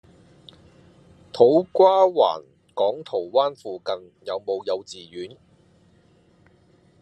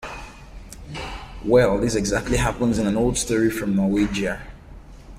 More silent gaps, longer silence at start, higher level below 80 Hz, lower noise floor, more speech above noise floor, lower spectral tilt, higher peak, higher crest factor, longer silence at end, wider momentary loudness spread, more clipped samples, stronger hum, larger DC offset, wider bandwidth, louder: neither; first, 1.35 s vs 0 s; second, -72 dBFS vs -36 dBFS; first, -58 dBFS vs -42 dBFS; first, 36 dB vs 21 dB; about the same, -6 dB/octave vs -5 dB/octave; about the same, -2 dBFS vs -4 dBFS; about the same, 22 dB vs 18 dB; first, 1.75 s vs 0 s; about the same, 20 LU vs 19 LU; neither; neither; neither; second, 9.2 kHz vs 16 kHz; about the same, -21 LUFS vs -21 LUFS